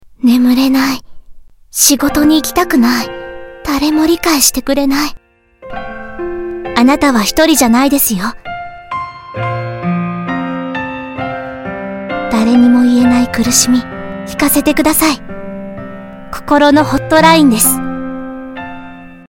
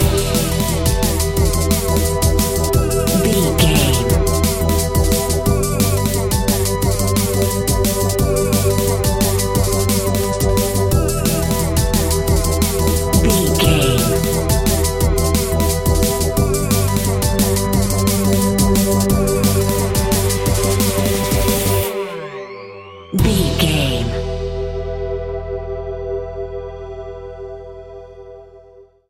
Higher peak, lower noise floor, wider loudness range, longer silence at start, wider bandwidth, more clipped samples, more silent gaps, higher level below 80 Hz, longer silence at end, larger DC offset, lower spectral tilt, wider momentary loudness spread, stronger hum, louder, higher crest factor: about the same, 0 dBFS vs 0 dBFS; second, -38 dBFS vs -45 dBFS; about the same, 6 LU vs 5 LU; first, 0.2 s vs 0 s; first, over 20 kHz vs 17 kHz; first, 0.4% vs under 0.1%; neither; second, -36 dBFS vs -24 dBFS; second, 0.05 s vs 0.3 s; neither; second, -3.5 dB/octave vs -5 dB/octave; first, 18 LU vs 11 LU; neither; first, -11 LUFS vs -16 LUFS; about the same, 12 dB vs 16 dB